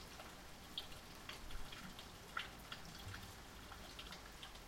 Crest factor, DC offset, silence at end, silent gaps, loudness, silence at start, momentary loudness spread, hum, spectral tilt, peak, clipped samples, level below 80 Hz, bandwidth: 24 dB; under 0.1%; 0 s; none; -52 LUFS; 0 s; 6 LU; none; -3 dB/octave; -28 dBFS; under 0.1%; -60 dBFS; 16.5 kHz